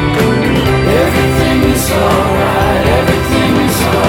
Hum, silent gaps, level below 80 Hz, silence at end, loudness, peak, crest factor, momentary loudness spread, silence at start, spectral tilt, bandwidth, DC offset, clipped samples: none; none; -22 dBFS; 0 s; -11 LUFS; 0 dBFS; 10 dB; 1 LU; 0 s; -5.5 dB/octave; 19 kHz; under 0.1%; under 0.1%